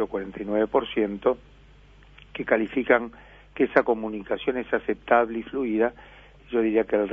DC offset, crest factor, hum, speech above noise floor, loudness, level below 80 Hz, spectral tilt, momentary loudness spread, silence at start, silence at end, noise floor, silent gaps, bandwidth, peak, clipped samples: under 0.1%; 22 dB; 50 Hz at -55 dBFS; 27 dB; -25 LUFS; -54 dBFS; -8 dB/octave; 9 LU; 0 s; 0 s; -51 dBFS; none; 5.2 kHz; -2 dBFS; under 0.1%